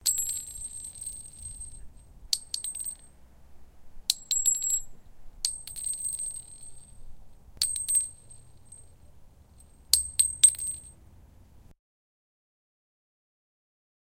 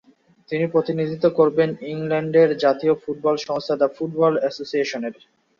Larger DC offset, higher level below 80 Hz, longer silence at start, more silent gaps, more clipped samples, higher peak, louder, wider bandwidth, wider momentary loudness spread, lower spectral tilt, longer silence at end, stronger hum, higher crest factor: neither; first, -52 dBFS vs -66 dBFS; second, 0 s vs 0.5 s; neither; neither; first, 0 dBFS vs -4 dBFS; second, -27 LUFS vs -21 LUFS; first, 17 kHz vs 7.2 kHz; first, 19 LU vs 8 LU; second, 2 dB/octave vs -6.5 dB/octave; first, 2.3 s vs 0.45 s; neither; first, 34 dB vs 16 dB